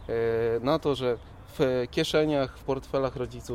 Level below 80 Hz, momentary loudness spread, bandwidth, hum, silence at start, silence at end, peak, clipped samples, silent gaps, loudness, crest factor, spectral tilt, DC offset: -48 dBFS; 8 LU; 15.5 kHz; none; 0 s; 0 s; -12 dBFS; under 0.1%; none; -28 LUFS; 16 dB; -6 dB/octave; under 0.1%